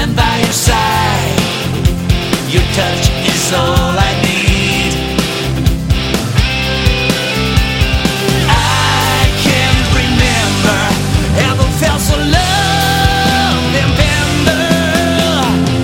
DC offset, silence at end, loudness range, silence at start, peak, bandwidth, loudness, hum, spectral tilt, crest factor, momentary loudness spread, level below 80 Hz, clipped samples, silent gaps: under 0.1%; 0 s; 2 LU; 0 s; 0 dBFS; 17 kHz; -12 LUFS; none; -4.5 dB/octave; 12 dB; 3 LU; -20 dBFS; under 0.1%; none